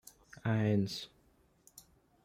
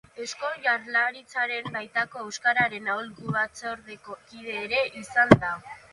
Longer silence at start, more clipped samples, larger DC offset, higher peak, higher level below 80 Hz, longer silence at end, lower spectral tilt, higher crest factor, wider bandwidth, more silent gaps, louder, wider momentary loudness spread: first, 0.45 s vs 0.15 s; neither; neither; second, -20 dBFS vs 0 dBFS; second, -68 dBFS vs -54 dBFS; first, 0.45 s vs 0.15 s; first, -6.5 dB/octave vs -5 dB/octave; second, 18 dB vs 26 dB; first, 15.5 kHz vs 11.5 kHz; neither; second, -34 LUFS vs -26 LUFS; first, 20 LU vs 17 LU